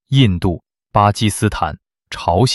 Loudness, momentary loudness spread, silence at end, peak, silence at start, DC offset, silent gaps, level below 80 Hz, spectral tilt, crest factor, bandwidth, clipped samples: -17 LUFS; 15 LU; 0 s; -2 dBFS; 0.1 s; under 0.1%; none; -36 dBFS; -5.5 dB/octave; 16 dB; 12.5 kHz; under 0.1%